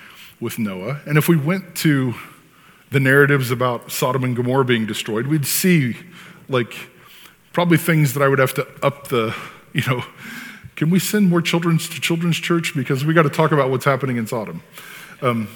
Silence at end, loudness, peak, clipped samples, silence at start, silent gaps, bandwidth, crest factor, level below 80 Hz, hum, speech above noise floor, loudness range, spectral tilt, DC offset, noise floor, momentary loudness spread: 0 s; -19 LUFS; 0 dBFS; under 0.1%; 0 s; none; 19 kHz; 20 dB; -62 dBFS; none; 31 dB; 3 LU; -5.5 dB/octave; under 0.1%; -50 dBFS; 16 LU